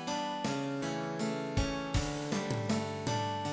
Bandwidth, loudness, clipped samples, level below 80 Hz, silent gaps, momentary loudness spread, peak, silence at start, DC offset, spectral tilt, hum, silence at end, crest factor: 8 kHz; -35 LUFS; under 0.1%; -46 dBFS; none; 2 LU; -18 dBFS; 0 s; under 0.1%; -5 dB/octave; none; 0 s; 16 dB